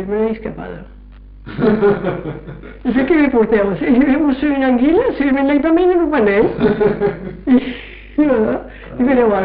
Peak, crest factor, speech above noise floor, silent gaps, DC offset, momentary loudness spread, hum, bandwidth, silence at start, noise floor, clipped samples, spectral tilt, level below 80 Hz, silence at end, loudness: -2 dBFS; 12 dB; 22 dB; none; under 0.1%; 15 LU; none; 4.9 kHz; 0 s; -37 dBFS; under 0.1%; -6 dB/octave; -38 dBFS; 0 s; -15 LUFS